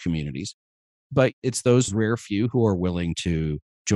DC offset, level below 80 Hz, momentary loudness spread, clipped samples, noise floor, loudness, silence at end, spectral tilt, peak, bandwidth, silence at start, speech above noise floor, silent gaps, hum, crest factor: under 0.1%; -44 dBFS; 10 LU; under 0.1%; under -90 dBFS; -24 LUFS; 0 s; -5.5 dB/octave; -6 dBFS; 12.5 kHz; 0 s; over 67 dB; 0.54-1.10 s, 1.33-1.42 s, 3.62-3.85 s; none; 18 dB